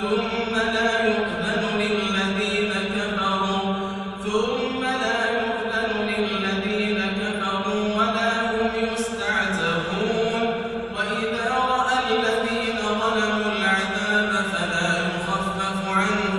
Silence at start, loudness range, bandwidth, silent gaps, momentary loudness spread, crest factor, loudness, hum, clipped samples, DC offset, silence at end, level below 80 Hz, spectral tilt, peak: 0 s; 2 LU; 12 kHz; none; 4 LU; 16 dB; -23 LUFS; none; under 0.1%; under 0.1%; 0 s; -50 dBFS; -4.5 dB/octave; -8 dBFS